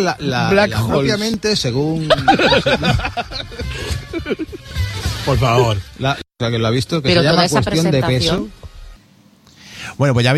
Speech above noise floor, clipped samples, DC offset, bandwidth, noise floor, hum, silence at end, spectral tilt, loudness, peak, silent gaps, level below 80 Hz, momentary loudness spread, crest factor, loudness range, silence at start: 33 dB; under 0.1%; under 0.1%; 14 kHz; -49 dBFS; none; 0 s; -5 dB/octave; -17 LUFS; 0 dBFS; none; -34 dBFS; 12 LU; 16 dB; 4 LU; 0 s